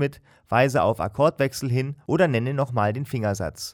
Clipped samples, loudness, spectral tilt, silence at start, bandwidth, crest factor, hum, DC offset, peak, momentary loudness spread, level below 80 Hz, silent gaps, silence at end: under 0.1%; -23 LUFS; -6.5 dB/octave; 0 s; 19.5 kHz; 16 dB; none; under 0.1%; -6 dBFS; 6 LU; -52 dBFS; none; 0 s